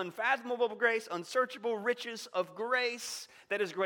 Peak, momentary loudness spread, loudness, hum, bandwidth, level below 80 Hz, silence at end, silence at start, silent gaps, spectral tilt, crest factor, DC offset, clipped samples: -14 dBFS; 7 LU; -33 LUFS; none; 19 kHz; under -90 dBFS; 0 s; 0 s; none; -2.5 dB/octave; 18 dB; under 0.1%; under 0.1%